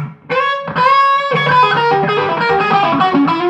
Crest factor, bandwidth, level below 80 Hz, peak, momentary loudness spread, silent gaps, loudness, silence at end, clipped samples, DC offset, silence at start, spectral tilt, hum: 12 dB; 8.4 kHz; -54 dBFS; 0 dBFS; 5 LU; none; -13 LUFS; 0 s; under 0.1%; under 0.1%; 0 s; -6.5 dB/octave; none